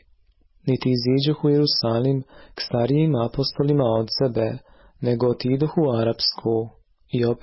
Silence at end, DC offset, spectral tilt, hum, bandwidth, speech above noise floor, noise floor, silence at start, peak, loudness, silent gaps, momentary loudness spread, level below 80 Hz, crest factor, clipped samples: 0.05 s; under 0.1%; -10 dB/octave; none; 5.8 kHz; 37 dB; -58 dBFS; 0.65 s; -10 dBFS; -22 LUFS; none; 9 LU; -52 dBFS; 12 dB; under 0.1%